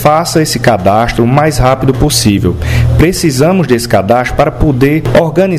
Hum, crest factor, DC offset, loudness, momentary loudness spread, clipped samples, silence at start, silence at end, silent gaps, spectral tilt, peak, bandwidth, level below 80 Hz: none; 8 dB; under 0.1%; -9 LUFS; 2 LU; 1%; 0 s; 0 s; none; -5.5 dB/octave; 0 dBFS; 16 kHz; -22 dBFS